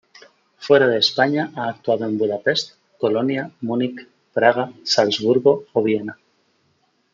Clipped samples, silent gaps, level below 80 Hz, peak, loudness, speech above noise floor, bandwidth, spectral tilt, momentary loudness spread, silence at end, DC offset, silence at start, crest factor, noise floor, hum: under 0.1%; none; -70 dBFS; -2 dBFS; -19 LUFS; 46 dB; 7.6 kHz; -4.5 dB/octave; 10 LU; 1 s; under 0.1%; 0.6 s; 18 dB; -65 dBFS; none